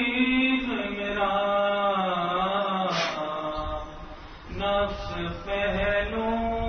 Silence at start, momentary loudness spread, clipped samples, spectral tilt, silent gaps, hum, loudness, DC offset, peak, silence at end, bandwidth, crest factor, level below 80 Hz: 0 s; 11 LU; under 0.1%; -5.5 dB/octave; none; none; -26 LUFS; under 0.1%; -12 dBFS; 0 s; 6.6 kHz; 14 dB; -42 dBFS